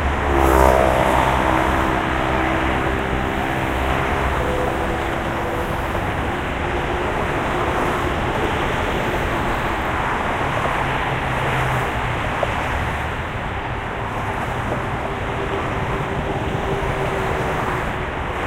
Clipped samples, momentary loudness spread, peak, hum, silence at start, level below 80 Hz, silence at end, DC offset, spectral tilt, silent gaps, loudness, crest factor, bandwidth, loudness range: under 0.1%; 7 LU; 0 dBFS; none; 0 s; -28 dBFS; 0 s; under 0.1%; -6 dB/octave; none; -21 LUFS; 20 dB; 16 kHz; 5 LU